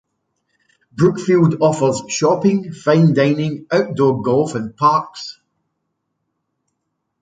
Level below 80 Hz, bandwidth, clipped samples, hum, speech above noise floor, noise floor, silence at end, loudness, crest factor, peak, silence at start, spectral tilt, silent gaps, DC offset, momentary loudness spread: -60 dBFS; 9.4 kHz; under 0.1%; none; 58 dB; -74 dBFS; 1.9 s; -16 LUFS; 16 dB; -2 dBFS; 0.95 s; -6.5 dB/octave; none; under 0.1%; 8 LU